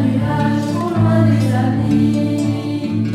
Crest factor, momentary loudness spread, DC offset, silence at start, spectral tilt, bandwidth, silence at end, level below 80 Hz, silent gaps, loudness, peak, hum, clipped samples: 12 dB; 6 LU; under 0.1%; 0 s; -8 dB/octave; 12 kHz; 0 s; -44 dBFS; none; -16 LUFS; -4 dBFS; none; under 0.1%